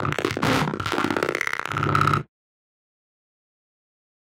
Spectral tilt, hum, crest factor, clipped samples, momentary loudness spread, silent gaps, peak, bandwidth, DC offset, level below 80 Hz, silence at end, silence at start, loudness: -5 dB/octave; none; 22 dB; under 0.1%; 4 LU; none; -4 dBFS; 17 kHz; under 0.1%; -52 dBFS; 2.1 s; 0 s; -23 LUFS